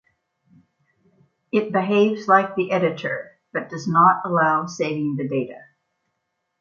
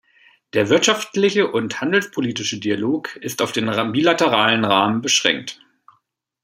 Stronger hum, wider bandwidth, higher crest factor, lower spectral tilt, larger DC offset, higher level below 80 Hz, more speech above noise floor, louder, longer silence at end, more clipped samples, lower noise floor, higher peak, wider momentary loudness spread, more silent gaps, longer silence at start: neither; second, 7.4 kHz vs 16 kHz; about the same, 20 dB vs 20 dB; first, -6.5 dB/octave vs -3.5 dB/octave; neither; second, -70 dBFS vs -64 dBFS; first, 56 dB vs 47 dB; second, -21 LUFS vs -18 LUFS; about the same, 1 s vs 0.9 s; neither; first, -76 dBFS vs -66 dBFS; about the same, -2 dBFS vs 0 dBFS; first, 13 LU vs 8 LU; neither; first, 1.55 s vs 0.55 s